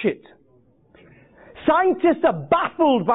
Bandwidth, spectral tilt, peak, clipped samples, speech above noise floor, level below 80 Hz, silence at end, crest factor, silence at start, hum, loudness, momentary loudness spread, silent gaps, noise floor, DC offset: 4 kHz; -11 dB/octave; -6 dBFS; under 0.1%; 38 dB; -56 dBFS; 0 s; 14 dB; 0 s; none; -20 LUFS; 8 LU; none; -57 dBFS; under 0.1%